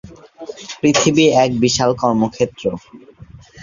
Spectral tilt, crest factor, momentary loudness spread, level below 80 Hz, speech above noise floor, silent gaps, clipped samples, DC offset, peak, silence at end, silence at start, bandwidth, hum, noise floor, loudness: -4.5 dB/octave; 16 dB; 20 LU; -48 dBFS; 18 dB; none; under 0.1%; under 0.1%; -2 dBFS; 0 s; 0.05 s; 7.6 kHz; none; -34 dBFS; -15 LUFS